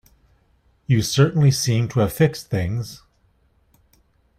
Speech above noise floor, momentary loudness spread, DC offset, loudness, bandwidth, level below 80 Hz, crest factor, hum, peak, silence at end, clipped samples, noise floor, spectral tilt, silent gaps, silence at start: 43 dB; 12 LU; under 0.1%; -20 LUFS; 15.5 kHz; -50 dBFS; 18 dB; none; -4 dBFS; 1.4 s; under 0.1%; -61 dBFS; -5.5 dB/octave; none; 0.9 s